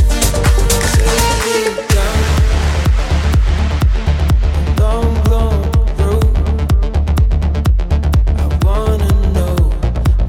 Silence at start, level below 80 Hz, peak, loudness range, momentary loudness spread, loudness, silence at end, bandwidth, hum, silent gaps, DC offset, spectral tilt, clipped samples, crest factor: 0 s; -14 dBFS; -2 dBFS; 1 LU; 3 LU; -14 LUFS; 0 s; 16.5 kHz; none; none; under 0.1%; -5.5 dB/octave; under 0.1%; 10 dB